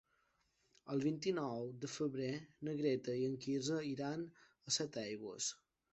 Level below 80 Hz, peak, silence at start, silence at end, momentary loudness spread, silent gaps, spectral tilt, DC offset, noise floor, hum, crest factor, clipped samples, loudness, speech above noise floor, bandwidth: -80 dBFS; -24 dBFS; 0.85 s; 0.35 s; 8 LU; none; -4.5 dB/octave; under 0.1%; -80 dBFS; none; 18 dB; under 0.1%; -41 LUFS; 39 dB; 8.2 kHz